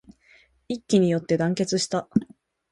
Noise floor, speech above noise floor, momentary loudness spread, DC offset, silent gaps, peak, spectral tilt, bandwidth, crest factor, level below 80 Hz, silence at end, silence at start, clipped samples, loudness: -58 dBFS; 35 dB; 8 LU; under 0.1%; none; -6 dBFS; -5.5 dB/octave; 11.5 kHz; 18 dB; -60 dBFS; 0.5 s; 0.7 s; under 0.1%; -24 LUFS